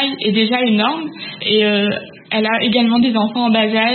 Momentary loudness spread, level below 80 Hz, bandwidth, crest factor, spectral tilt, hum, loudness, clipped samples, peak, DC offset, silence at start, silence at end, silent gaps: 8 LU; -62 dBFS; 4.4 kHz; 12 dB; -10.5 dB/octave; none; -15 LUFS; under 0.1%; -2 dBFS; under 0.1%; 0 s; 0 s; none